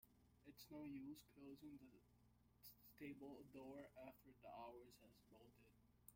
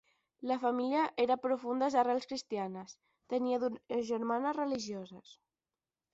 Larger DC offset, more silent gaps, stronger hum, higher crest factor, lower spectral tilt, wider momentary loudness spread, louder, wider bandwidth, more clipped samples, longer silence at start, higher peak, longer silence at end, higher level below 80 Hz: neither; neither; neither; about the same, 20 dB vs 18 dB; first, -5.5 dB/octave vs -3.5 dB/octave; second, 9 LU vs 12 LU; second, -61 LUFS vs -34 LUFS; first, 16.5 kHz vs 8 kHz; neither; second, 0 s vs 0.4 s; second, -42 dBFS vs -18 dBFS; second, 0 s vs 0.8 s; about the same, -82 dBFS vs -78 dBFS